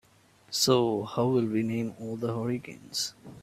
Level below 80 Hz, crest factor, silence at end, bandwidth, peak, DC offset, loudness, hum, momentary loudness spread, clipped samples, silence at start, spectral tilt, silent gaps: -66 dBFS; 20 dB; 0.05 s; 16 kHz; -8 dBFS; under 0.1%; -29 LUFS; none; 11 LU; under 0.1%; 0.5 s; -4.5 dB/octave; none